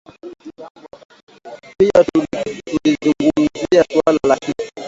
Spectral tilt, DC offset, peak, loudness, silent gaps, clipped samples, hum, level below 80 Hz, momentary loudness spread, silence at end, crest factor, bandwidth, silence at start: -5.5 dB/octave; under 0.1%; 0 dBFS; -16 LUFS; 0.70-0.75 s, 1.05-1.09 s, 1.23-1.27 s; under 0.1%; none; -50 dBFS; 23 LU; 0 s; 18 dB; 7.8 kHz; 0.25 s